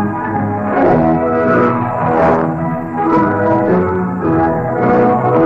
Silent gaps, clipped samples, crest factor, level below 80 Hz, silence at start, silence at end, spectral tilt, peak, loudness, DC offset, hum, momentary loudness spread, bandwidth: none; under 0.1%; 12 dB; -40 dBFS; 0 s; 0 s; -10 dB/octave; -2 dBFS; -13 LUFS; 0.6%; none; 6 LU; 7.4 kHz